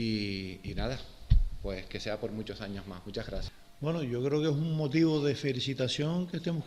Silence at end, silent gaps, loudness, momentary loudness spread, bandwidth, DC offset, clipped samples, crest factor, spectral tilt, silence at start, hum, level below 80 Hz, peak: 0 s; none; -33 LUFS; 13 LU; 13 kHz; under 0.1%; under 0.1%; 20 dB; -6.5 dB/octave; 0 s; none; -38 dBFS; -12 dBFS